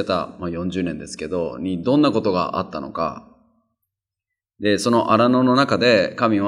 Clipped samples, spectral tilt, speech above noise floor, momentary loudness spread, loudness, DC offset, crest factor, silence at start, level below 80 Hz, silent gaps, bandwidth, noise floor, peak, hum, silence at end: under 0.1%; -5.5 dB/octave; 65 dB; 11 LU; -20 LUFS; under 0.1%; 18 dB; 0 s; -54 dBFS; none; 12 kHz; -85 dBFS; -2 dBFS; none; 0 s